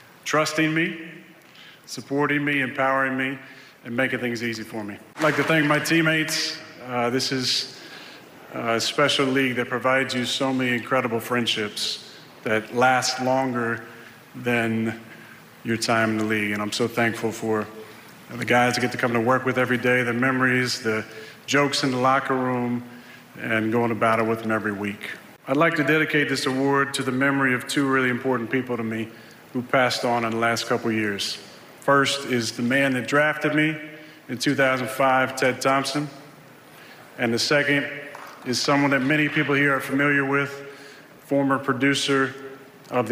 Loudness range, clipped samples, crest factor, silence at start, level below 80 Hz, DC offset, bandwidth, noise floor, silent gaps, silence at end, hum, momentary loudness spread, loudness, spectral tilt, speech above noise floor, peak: 3 LU; under 0.1%; 18 dB; 0.25 s; -68 dBFS; under 0.1%; 16 kHz; -48 dBFS; none; 0 s; none; 15 LU; -22 LUFS; -4.5 dB/octave; 25 dB; -6 dBFS